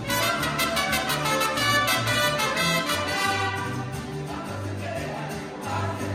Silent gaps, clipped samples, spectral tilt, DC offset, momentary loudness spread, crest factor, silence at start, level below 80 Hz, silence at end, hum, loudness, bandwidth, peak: none; under 0.1%; -3 dB/octave; under 0.1%; 11 LU; 16 dB; 0 s; -48 dBFS; 0 s; none; -25 LUFS; 16.5 kHz; -10 dBFS